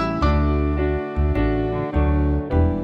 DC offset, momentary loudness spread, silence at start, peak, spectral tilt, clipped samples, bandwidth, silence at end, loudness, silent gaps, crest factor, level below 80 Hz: under 0.1%; 3 LU; 0 s; -6 dBFS; -9.5 dB/octave; under 0.1%; 5.8 kHz; 0 s; -21 LUFS; none; 12 dB; -24 dBFS